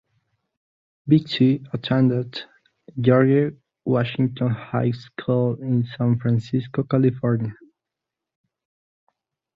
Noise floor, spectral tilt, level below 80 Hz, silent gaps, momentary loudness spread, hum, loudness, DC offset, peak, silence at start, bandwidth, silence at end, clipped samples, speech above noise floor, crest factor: -85 dBFS; -9.5 dB/octave; -60 dBFS; none; 11 LU; none; -22 LUFS; under 0.1%; -2 dBFS; 1.05 s; 5.4 kHz; 2 s; under 0.1%; 65 dB; 20 dB